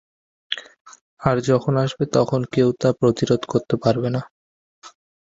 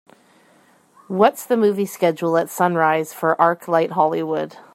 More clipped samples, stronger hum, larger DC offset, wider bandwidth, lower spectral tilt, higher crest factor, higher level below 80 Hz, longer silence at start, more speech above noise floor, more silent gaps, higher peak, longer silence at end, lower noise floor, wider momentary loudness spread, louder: neither; neither; neither; second, 7.8 kHz vs 16 kHz; about the same, -6.5 dB/octave vs -5.5 dB/octave; about the same, 20 dB vs 18 dB; first, -54 dBFS vs -70 dBFS; second, 0.5 s vs 1.1 s; first, over 71 dB vs 36 dB; first, 0.81-0.85 s, 1.01-1.17 s, 4.31-4.82 s vs none; about the same, -2 dBFS vs -2 dBFS; first, 0.45 s vs 0.15 s; first, under -90 dBFS vs -55 dBFS; first, 10 LU vs 5 LU; about the same, -21 LUFS vs -19 LUFS